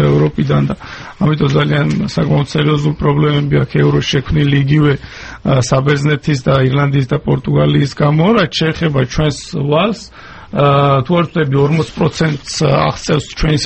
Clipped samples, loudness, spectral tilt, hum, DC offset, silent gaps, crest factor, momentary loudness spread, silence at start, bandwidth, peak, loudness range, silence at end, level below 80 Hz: under 0.1%; -13 LUFS; -6.5 dB/octave; none; under 0.1%; none; 12 dB; 5 LU; 0 s; 8.6 kHz; 0 dBFS; 1 LU; 0 s; -32 dBFS